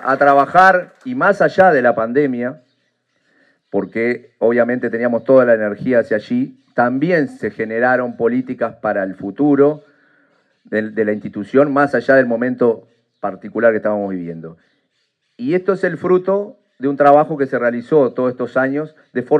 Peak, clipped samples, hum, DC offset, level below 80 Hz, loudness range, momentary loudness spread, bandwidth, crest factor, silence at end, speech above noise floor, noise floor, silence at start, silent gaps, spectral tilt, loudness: 0 dBFS; under 0.1%; none; under 0.1%; -64 dBFS; 4 LU; 13 LU; 9 kHz; 16 dB; 0 s; 52 dB; -67 dBFS; 0 s; none; -8 dB/octave; -16 LUFS